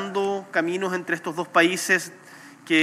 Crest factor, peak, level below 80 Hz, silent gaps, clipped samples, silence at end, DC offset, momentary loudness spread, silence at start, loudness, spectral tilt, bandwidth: 18 dB; -6 dBFS; -86 dBFS; none; under 0.1%; 0 s; under 0.1%; 8 LU; 0 s; -23 LUFS; -3.5 dB/octave; 16 kHz